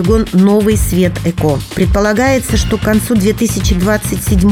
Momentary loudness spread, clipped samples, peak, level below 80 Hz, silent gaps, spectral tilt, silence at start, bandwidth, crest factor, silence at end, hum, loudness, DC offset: 5 LU; under 0.1%; 0 dBFS; -20 dBFS; none; -5.5 dB/octave; 0 s; 19 kHz; 12 dB; 0 s; none; -12 LUFS; under 0.1%